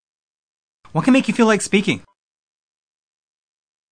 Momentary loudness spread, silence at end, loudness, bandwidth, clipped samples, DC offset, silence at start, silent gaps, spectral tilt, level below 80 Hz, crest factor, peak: 10 LU; 1.95 s; -17 LUFS; 10.5 kHz; under 0.1%; under 0.1%; 0.95 s; none; -5 dB/octave; -62 dBFS; 20 dB; -2 dBFS